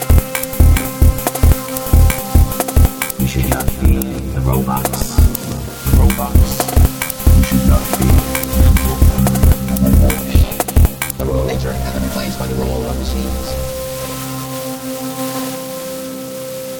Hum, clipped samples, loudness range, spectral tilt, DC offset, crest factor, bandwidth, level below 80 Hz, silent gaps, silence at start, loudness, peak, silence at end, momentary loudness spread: none; under 0.1%; 8 LU; -5.5 dB/octave; under 0.1%; 14 dB; 20 kHz; -16 dBFS; none; 0 s; -16 LUFS; 0 dBFS; 0 s; 10 LU